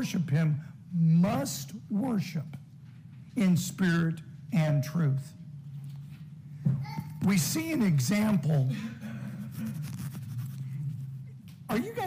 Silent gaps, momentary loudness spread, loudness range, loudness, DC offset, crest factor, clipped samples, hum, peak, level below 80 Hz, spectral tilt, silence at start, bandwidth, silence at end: none; 18 LU; 4 LU; -30 LUFS; under 0.1%; 14 dB; under 0.1%; none; -16 dBFS; -64 dBFS; -6 dB/octave; 0 s; 16 kHz; 0 s